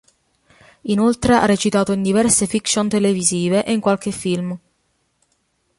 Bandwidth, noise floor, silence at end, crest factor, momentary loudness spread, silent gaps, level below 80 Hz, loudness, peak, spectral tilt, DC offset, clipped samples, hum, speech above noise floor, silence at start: 11.5 kHz; -66 dBFS; 1.2 s; 18 dB; 8 LU; none; -46 dBFS; -17 LUFS; 0 dBFS; -4.5 dB/octave; under 0.1%; under 0.1%; none; 49 dB; 0.85 s